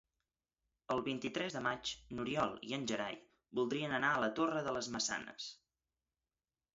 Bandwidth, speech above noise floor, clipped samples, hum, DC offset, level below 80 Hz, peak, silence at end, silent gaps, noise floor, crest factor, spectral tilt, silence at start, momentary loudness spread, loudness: 7.6 kHz; over 52 dB; under 0.1%; none; under 0.1%; -72 dBFS; -20 dBFS; 1.2 s; none; under -90 dBFS; 20 dB; -2.5 dB/octave; 0.9 s; 10 LU; -38 LUFS